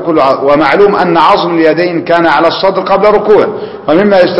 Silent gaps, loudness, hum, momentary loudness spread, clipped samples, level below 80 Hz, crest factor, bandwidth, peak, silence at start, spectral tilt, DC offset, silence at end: none; -8 LUFS; none; 5 LU; 1%; -42 dBFS; 8 dB; 8.2 kHz; 0 dBFS; 0 s; -7 dB/octave; 0.7%; 0 s